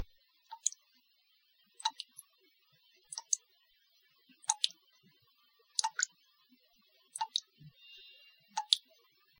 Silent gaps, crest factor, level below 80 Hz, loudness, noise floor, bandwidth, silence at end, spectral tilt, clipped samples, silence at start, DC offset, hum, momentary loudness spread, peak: none; 38 dB; -78 dBFS; -36 LUFS; -73 dBFS; 17 kHz; 0.6 s; 3 dB/octave; under 0.1%; 0 s; under 0.1%; none; 23 LU; -4 dBFS